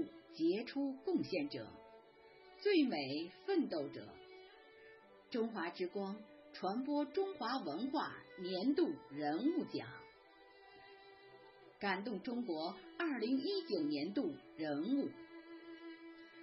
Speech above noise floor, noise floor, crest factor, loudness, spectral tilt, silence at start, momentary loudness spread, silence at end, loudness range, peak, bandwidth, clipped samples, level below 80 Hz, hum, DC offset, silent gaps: 24 dB; -64 dBFS; 18 dB; -40 LUFS; -3.5 dB/octave; 0 s; 22 LU; 0 s; 5 LU; -22 dBFS; 5.8 kHz; under 0.1%; -84 dBFS; none; under 0.1%; none